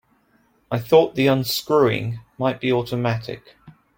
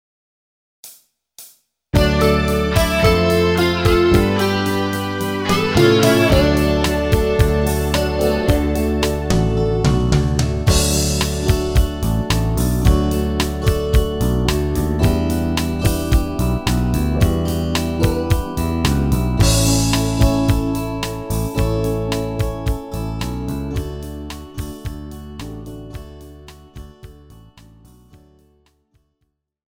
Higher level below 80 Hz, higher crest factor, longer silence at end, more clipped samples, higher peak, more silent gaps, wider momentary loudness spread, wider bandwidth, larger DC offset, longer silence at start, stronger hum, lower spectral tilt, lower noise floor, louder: second, -56 dBFS vs -24 dBFS; about the same, 18 dB vs 16 dB; second, 0.3 s vs 2.65 s; neither; about the same, -2 dBFS vs -2 dBFS; neither; about the same, 12 LU vs 11 LU; about the same, 17 kHz vs 17 kHz; neither; second, 0.7 s vs 0.85 s; neither; about the same, -6 dB/octave vs -5.5 dB/octave; second, -61 dBFS vs -71 dBFS; about the same, -20 LUFS vs -18 LUFS